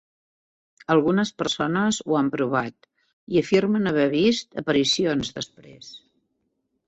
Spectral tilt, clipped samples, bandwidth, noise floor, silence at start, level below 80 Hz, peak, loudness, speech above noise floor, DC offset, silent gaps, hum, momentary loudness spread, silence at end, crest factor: -5 dB/octave; under 0.1%; 8.2 kHz; -74 dBFS; 0.9 s; -58 dBFS; -6 dBFS; -22 LUFS; 52 dB; under 0.1%; 3.13-3.27 s; none; 15 LU; 0.9 s; 18 dB